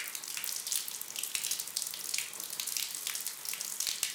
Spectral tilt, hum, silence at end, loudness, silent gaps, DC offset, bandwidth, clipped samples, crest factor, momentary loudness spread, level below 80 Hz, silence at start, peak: 2.5 dB/octave; none; 0 s; -34 LUFS; none; under 0.1%; 19 kHz; under 0.1%; 26 dB; 4 LU; -84 dBFS; 0 s; -12 dBFS